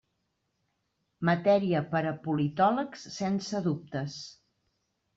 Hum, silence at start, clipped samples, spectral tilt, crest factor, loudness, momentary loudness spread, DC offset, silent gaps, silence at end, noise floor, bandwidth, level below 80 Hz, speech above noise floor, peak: none; 1.2 s; under 0.1%; -6.5 dB/octave; 18 dB; -29 LUFS; 12 LU; under 0.1%; none; 0.85 s; -79 dBFS; 7.8 kHz; -70 dBFS; 50 dB; -12 dBFS